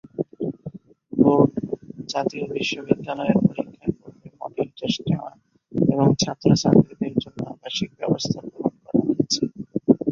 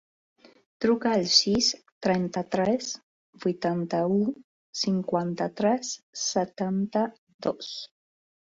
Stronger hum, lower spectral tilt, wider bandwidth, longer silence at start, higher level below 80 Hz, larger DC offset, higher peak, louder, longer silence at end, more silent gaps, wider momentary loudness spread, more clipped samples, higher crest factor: neither; first, -6 dB/octave vs -4 dB/octave; about the same, 7.6 kHz vs 7.8 kHz; second, 0.2 s vs 0.8 s; first, -54 dBFS vs -64 dBFS; neither; first, 0 dBFS vs -6 dBFS; first, -23 LUFS vs -27 LUFS; second, 0 s vs 0.6 s; second, none vs 1.92-2.01 s, 3.03-3.33 s, 4.44-4.73 s, 6.03-6.13 s, 7.18-7.27 s, 7.34-7.39 s; about the same, 14 LU vs 13 LU; neither; about the same, 22 dB vs 22 dB